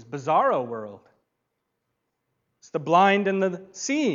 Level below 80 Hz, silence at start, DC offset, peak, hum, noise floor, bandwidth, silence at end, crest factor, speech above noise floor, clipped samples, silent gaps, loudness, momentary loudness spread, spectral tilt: -78 dBFS; 0.1 s; under 0.1%; -6 dBFS; none; -79 dBFS; 7.8 kHz; 0 s; 20 dB; 56 dB; under 0.1%; none; -23 LUFS; 15 LU; -5 dB/octave